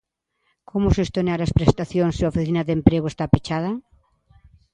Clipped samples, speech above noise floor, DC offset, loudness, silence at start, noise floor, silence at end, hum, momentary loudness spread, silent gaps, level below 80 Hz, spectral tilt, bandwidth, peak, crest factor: under 0.1%; 51 dB; under 0.1%; -21 LUFS; 0.75 s; -71 dBFS; 0.95 s; none; 7 LU; none; -34 dBFS; -7.5 dB/octave; 9.4 kHz; 0 dBFS; 22 dB